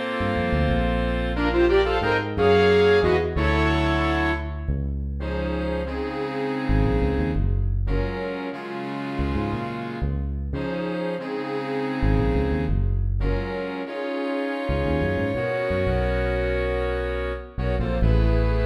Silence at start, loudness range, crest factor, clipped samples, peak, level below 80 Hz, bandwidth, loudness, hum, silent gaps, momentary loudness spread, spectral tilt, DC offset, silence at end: 0 s; 7 LU; 16 dB; under 0.1%; -6 dBFS; -28 dBFS; 10.5 kHz; -24 LUFS; none; none; 9 LU; -8 dB/octave; under 0.1%; 0 s